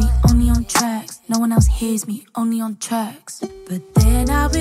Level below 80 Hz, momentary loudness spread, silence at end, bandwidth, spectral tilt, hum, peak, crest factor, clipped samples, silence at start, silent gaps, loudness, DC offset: -22 dBFS; 13 LU; 0 s; 16 kHz; -5.5 dB/octave; none; -2 dBFS; 16 dB; under 0.1%; 0 s; none; -19 LUFS; under 0.1%